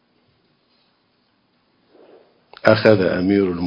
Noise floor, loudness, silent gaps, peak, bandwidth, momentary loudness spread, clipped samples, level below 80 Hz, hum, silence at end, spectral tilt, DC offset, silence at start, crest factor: -64 dBFS; -16 LUFS; none; 0 dBFS; 7.4 kHz; 4 LU; under 0.1%; -50 dBFS; none; 0 s; -8 dB/octave; under 0.1%; 2.65 s; 20 dB